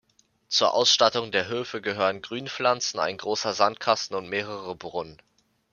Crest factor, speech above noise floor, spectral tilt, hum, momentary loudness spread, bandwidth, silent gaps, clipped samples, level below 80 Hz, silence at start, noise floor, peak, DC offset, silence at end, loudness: 22 dB; 30 dB; -2 dB/octave; none; 14 LU; 7.2 kHz; none; under 0.1%; -70 dBFS; 0.5 s; -55 dBFS; -4 dBFS; under 0.1%; 0.6 s; -25 LUFS